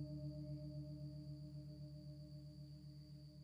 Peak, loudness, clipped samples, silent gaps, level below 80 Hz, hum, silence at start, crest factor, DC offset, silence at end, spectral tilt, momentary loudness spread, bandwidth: -40 dBFS; -54 LUFS; under 0.1%; none; -66 dBFS; none; 0 s; 12 dB; under 0.1%; 0 s; -8.5 dB/octave; 8 LU; 11 kHz